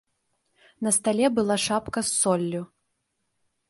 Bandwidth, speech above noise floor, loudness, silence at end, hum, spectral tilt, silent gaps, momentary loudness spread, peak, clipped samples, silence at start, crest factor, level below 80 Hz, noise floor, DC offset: 12 kHz; 52 dB; -24 LUFS; 1.05 s; none; -3.5 dB/octave; none; 9 LU; -8 dBFS; under 0.1%; 0.8 s; 18 dB; -60 dBFS; -76 dBFS; under 0.1%